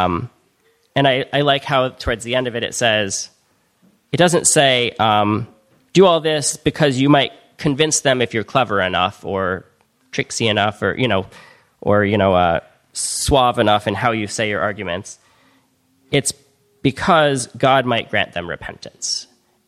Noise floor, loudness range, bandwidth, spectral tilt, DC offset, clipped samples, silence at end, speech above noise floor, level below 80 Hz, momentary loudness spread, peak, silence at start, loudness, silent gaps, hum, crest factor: -61 dBFS; 4 LU; 15 kHz; -3.5 dB/octave; under 0.1%; under 0.1%; 0.45 s; 44 dB; -44 dBFS; 12 LU; 0 dBFS; 0 s; -17 LUFS; none; none; 18 dB